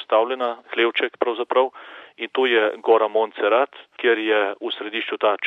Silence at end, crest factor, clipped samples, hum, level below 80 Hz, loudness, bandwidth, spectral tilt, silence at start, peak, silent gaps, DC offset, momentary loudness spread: 0 s; 18 dB; under 0.1%; none; -88 dBFS; -21 LUFS; 4.2 kHz; -4.5 dB/octave; 0 s; -4 dBFS; none; under 0.1%; 8 LU